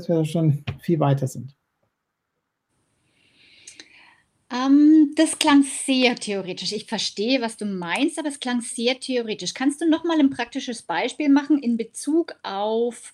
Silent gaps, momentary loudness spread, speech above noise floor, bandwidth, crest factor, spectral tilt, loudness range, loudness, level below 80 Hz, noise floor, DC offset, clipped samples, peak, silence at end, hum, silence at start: none; 11 LU; 57 dB; 12.5 kHz; 22 dB; -5 dB/octave; 8 LU; -22 LUFS; -64 dBFS; -78 dBFS; under 0.1%; under 0.1%; 0 dBFS; 0.05 s; none; 0 s